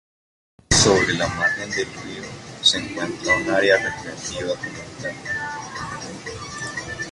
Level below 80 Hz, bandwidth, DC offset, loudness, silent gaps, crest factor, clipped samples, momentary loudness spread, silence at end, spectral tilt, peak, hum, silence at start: -44 dBFS; 11.5 kHz; under 0.1%; -21 LUFS; none; 20 dB; under 0.1%; 16 LU; 0 s; -2.5 dB/octave; -4 dBFS; none; 0.7 s